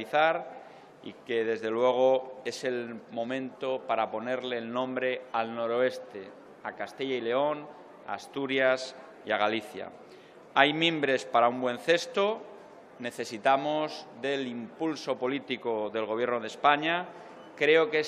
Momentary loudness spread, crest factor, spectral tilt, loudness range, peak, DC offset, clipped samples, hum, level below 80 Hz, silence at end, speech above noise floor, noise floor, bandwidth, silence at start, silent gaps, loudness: 17 LU; 26 dB; -4 dB/octave; 5 LU; -4 dBFS; under 0.1%; under 0.1%; none; -82 dBFS; 0 s; 23 dB; -52 dBFS; 13 kHz; 0 s; none; -29 LUFS